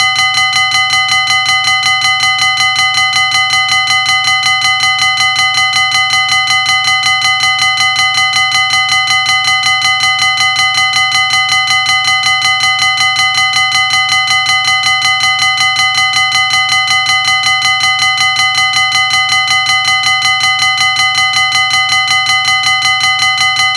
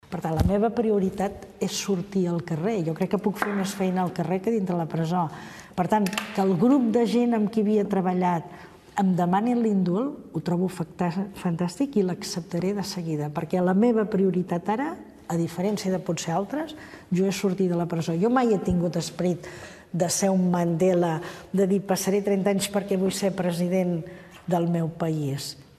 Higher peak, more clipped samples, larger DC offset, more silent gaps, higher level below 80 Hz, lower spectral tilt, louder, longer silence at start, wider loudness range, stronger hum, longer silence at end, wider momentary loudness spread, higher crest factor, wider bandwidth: first, 0 dBFS vs -8 dBFS; neither; neither; neither; about the same, -48 dBFS vs -48 dBFS; second, 1.5 dB/octave vs -6 dB/octave; first, -8 LUFS vs -25 LUFS; about the same, 0 s vs 0.1 s; second, 0 LU vs 3 LU; neither; second, 0 s vs 0.15 s; second, 0 LU vs 9 LU; second, 10 dB vs 18 dB; second, 11 kHz vs 13.5 kHz